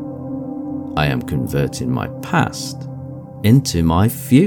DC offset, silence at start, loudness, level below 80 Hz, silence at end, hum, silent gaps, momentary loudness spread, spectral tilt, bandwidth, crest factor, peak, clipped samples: under 0.1%; 0 s; -19 LUFS; -38 dBFS; 0 s; none; none; 13 LU; -6 dB/octave; 19 kHz; 16 dB; 0 dBFS; under 0.1%